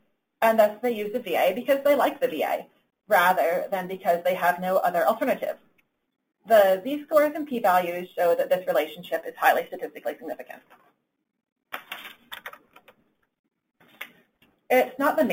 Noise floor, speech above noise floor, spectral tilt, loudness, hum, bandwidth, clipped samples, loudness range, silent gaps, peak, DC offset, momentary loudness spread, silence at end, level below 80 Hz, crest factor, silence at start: -64 dBFS; 41 dB; -4.5 dB/octave; -24 LUFS; none; 17 kHz; under 0.1%; 19 LU; 11.52-11.56 s, 13.39-13.44 s; -6 dBFS; under 0.1%; 20 LU; 0 s; -74 dBFS; 20 dB; 0.4 s